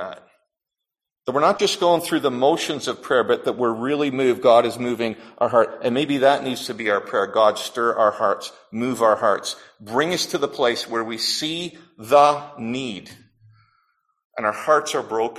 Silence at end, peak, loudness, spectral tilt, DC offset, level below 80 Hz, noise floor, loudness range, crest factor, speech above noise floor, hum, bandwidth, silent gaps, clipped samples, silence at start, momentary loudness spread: 0 s; -2 dBFS; -21 LUFS; -4 dB/octave; under 0.1%; -66 dBFS; -85 dBFS; 3 LU; 18 dB; 64 dB; none; 15 kHz; 14.25-14.30 s; under 0.1%; 0 s; 11 LU